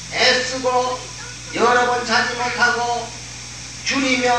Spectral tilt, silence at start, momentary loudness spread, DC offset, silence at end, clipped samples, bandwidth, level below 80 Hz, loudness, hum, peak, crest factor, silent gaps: -2 dB/octave; 0 s; 15 LU; 0.2%; 0 s; under 0.1%; 12.5 kHz; -46 dBFS; -18 LUFS; 60 Hz at -40 dBFS; -2 dBFS; 18 dB; none